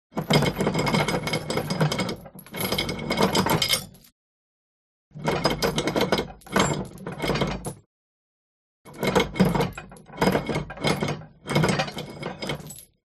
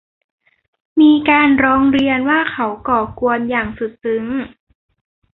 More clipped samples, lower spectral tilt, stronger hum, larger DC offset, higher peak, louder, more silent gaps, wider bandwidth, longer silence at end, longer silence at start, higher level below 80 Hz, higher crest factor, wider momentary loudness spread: neither; second, -4.5 dB/octave vs -7.5 dB/octave; neither; neither; about the same, -4 dBFS vs -2 dBFS; second, -25 LUFS vs -15 LUFS; first, 4.12-5.11 s, 7.86-8.85 s vs none; first, 13 kHz vs 4.1 kHz; second, 0.25 s vs 0.9 s; second, 0.15 s vs 0.95 s; about the same, -46 dBFS vs -46 dBFS; first, 22 dB vs 14 dB; about the same, 13 LU vs 12 LU